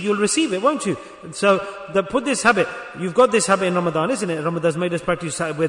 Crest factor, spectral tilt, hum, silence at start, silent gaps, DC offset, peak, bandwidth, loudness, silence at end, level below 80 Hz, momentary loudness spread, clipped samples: 16 dB; -4 dB/octave; none; 0 s; none; under 0.1%; -4 dBFS; 11 kHz; -20 LUFS; 0 s; -56 dBFS; 8 LU; under 0.1%